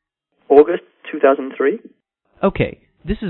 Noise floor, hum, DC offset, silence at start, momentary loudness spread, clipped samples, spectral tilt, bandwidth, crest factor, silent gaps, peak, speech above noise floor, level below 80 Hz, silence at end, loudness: -55 dBFS; none; under 0.1%; 0.5 s; 17 LU; under 0.1%; -10 dB/octave; 4.1 kHz; 18 dB; none; 0 dBFS; 40 dB; -40 dBFS; 0 s; -17 LUFS